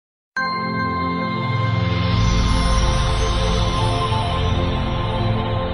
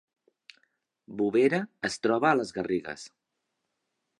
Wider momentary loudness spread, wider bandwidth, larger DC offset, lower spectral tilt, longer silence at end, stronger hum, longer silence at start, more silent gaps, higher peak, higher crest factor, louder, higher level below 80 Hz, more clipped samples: second, 4 LU vs 18 LU; about the same, 11 kHz vs 11 kHz; neither; about the same, -5.5 dB/octave vs -5.5 dB/octave; second, 0 s vs 1.1 s; neither; second, 0.35 s vs 1.1 s; neither; about the same, -6 dBFS vs -8 dBFS; second, 14 dB vs 22 dB; first, -20 LUFS vs -27 LUFS; first, -24 dBFS vs -70 dBFS; neither